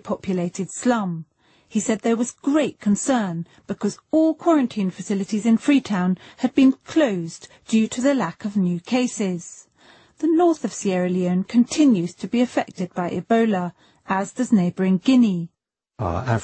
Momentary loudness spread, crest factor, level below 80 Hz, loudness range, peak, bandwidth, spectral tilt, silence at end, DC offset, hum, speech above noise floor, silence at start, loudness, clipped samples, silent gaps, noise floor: 10 LU; 16 dB; -56 dBFS; 3 LU; -6 dBFS; 8.8 kHz; -6 dB/octave; 0 s; under 0.1%; none; 32 dB; 0.05 s; -21 LUFS; under 0.1%; none; -53 dBFS